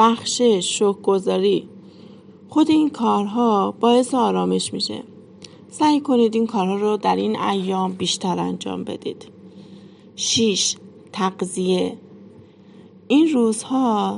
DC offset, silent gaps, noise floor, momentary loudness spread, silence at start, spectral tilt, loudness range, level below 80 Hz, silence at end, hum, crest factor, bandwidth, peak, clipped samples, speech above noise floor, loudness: under 0.1%; none; -46 dBFS; 11 LU; 0 s; -4.5 dB/octave; 4 LU; -70 dBFS; 0 s; none; 18 dB; 11 kHz; -4 dBFS; under 0.1%; 27 dB; -20 LUFS